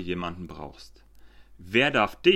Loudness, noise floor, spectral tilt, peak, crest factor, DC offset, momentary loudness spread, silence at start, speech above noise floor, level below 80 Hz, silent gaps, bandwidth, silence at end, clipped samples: -24 LUFS; -50 dBFS; -5.5 dB/octave; -6 dBFS; 22 dB; under 0.1%; 20 LU; 0 s; 24 dB; -52 dBFS; none; 12.5 kHz; 0 s; under 0.1%